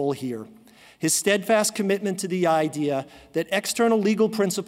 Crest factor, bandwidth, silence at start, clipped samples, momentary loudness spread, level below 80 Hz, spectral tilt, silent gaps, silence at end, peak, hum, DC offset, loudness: 16 dB; 16 kHz; 0 s; under 0.1%; 10 LU; -66 dBFS; -4 dB/octave; none; 0 s; -8 dBFS; none; under 0.1%; -23 LUFS